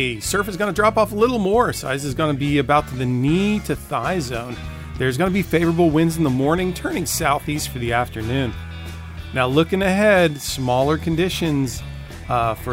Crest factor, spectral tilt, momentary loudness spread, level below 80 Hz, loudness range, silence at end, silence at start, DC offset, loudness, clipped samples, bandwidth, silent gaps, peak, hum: 16 dB; -5.5 dB/octave; 10 LU; -38 dBFS; 2 LU; 0 s; 0 s; under 0.1%; -20 LUFS; under 0.1%; 16 kHz; none; -4 dBFS; none